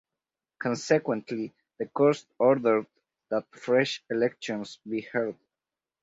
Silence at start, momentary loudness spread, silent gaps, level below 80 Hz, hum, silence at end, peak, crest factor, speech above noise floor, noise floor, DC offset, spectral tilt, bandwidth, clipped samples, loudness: 0.6 s; 11 LU; none; -74 dBFS; none; 0.7 s; -10 dBFS; 20 dB; over 63 dB; under -90 dBFS; under 0.1%; -5.5 dB/octave; 8 kHz; under 0.1%; -28 LUFS